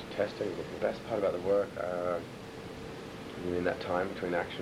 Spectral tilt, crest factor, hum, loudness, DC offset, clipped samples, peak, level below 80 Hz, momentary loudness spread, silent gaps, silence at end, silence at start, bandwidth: -6 dB/octave; 20 dB; none; -34 LUFS; under 0.1%; under 0.1%; -14 dBFS; -60 dBFS; 13 LU; none; 0 s; 0 s; 14.5 kHz